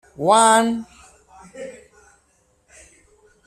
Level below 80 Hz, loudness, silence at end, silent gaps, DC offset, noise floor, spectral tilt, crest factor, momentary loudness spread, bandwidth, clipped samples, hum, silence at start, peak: -60 dBFS; -16 LUFS; 1.75 s; none; under 0.1%; -62 dBFS; -3 dB/octave; 20 dB; 24 LU; 14.5 kHz; under 0.1%; none; 0.2 s; -2 dBFS